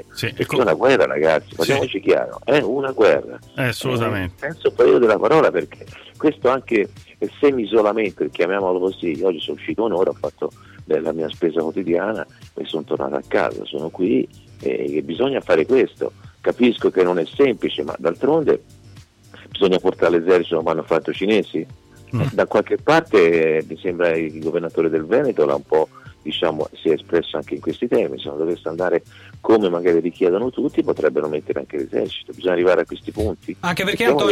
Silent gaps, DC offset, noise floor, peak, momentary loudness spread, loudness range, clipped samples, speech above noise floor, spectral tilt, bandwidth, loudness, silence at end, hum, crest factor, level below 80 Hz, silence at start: none; under 0.1%; -45 dBFS; -6 dBFS; 11 LU; 5 LU; under 0.1%; 26 dB; -6 dB/octave; 14.5 kHz; -20 LUFS; 0 s; none; 14 dB; -52 dBFS; 0.15 s